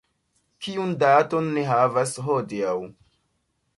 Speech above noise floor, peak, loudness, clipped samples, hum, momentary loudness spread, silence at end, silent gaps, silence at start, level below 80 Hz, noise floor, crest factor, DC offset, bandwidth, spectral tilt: 50 dB; -6 dBFS; -23 LUFS; under 0.1%; none; 13 LU; 0.85 s; none; 0.6 s; -66 dBFS; -72 dBFS; 18 dB; under 0.1%; 11.5 kHz; -5.5 dB/octave